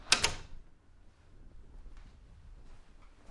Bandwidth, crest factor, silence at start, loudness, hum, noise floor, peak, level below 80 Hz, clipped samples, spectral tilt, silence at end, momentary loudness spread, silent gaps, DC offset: 11.5 kHz; 34 dB; 0 s; -31 LUFS; none; -58 dBFS; -4 dBFS; -52 dBFS; under 0.1%; -0.5 dB/octave; 0.1 s; 31 LU; none; under 0.1%